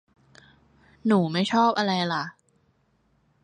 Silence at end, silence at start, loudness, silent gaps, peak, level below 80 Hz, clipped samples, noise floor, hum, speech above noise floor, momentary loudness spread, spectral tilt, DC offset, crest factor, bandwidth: 1.15 s; 1.05 s; -24 LUFS; none; -8 dBFS; -68 dBFS; under 0.1%; -67 dBFS; none; 44 dB; 9 LU; -6 dB/octave; under 0.1%; 18 dB; 9.8 kHz